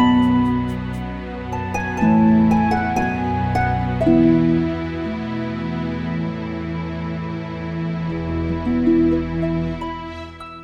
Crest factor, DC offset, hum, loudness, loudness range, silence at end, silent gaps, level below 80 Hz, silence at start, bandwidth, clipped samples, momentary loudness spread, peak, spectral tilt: 16 dB; under 0.1%; none; -20 LUFS; 8 LU; 0 s; none; -36 dBFS; 0 s; 7.6 kHz; under 0.1%; 13 LU; -4 dBFS; -8 dB/octave